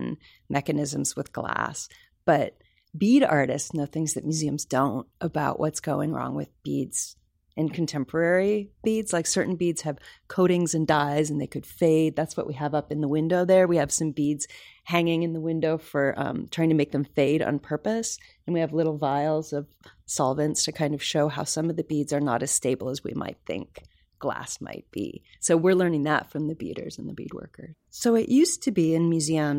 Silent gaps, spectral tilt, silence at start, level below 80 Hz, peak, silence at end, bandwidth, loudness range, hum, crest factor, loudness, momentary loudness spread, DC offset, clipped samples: none; -5 dB/octave; 0 s; -60 dBFS; -10 dBFS; 0 s; 16.5 kHz; 4 LU; none; 16 dB; -26 LUFS; 13 LU; under 0.1%; under 0.1%